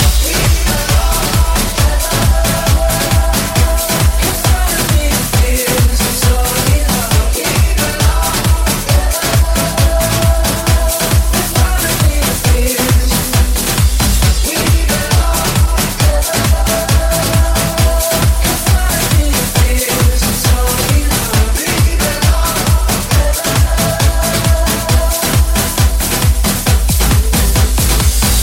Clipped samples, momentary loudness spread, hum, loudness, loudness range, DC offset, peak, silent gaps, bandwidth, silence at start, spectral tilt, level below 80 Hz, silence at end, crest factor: under 0.1%; 1 LU; none; -12 LUFS; 0 LU; under 0.1%; 0 dBFS; none; 17 kHz; 0 s; -4 dB/octave; -14 dBFS; 0 s; 12 dB